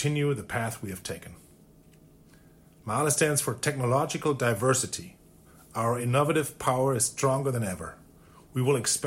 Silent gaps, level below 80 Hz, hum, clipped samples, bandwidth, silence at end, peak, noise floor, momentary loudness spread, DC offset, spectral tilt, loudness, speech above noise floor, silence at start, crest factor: none; -60 dBFS; none; under 0.1%; 17 kHz; 0 s; -10 dBFS; -56 dBFS; 14 LU; under 0.1%; -4.5 dB/octave; -27 LUFS; 28 dB; 0 s; 18 dB